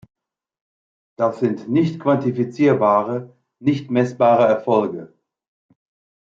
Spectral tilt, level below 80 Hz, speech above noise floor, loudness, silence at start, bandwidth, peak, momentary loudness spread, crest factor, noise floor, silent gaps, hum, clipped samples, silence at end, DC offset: -8.5 dB/octave; -68 dBFS; over 72 dB; -19 LUFS; 1.2 s; 7.6 kHz; -4 dBFS; 9 LU; 16 dB; under -90 dBFS; none; none; under 0.1%; 1.2 s; under 0.1%